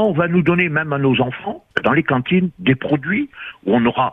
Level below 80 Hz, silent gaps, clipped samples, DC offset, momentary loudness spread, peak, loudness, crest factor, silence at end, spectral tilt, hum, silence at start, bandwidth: -52 dBFS; none; under 0.1%; under 0.1%; 7 LU; 0 dBFS; -18 LUFS; 16 dB; 0 s; -9 dB/octave; none; 0 s; 3.9 kHz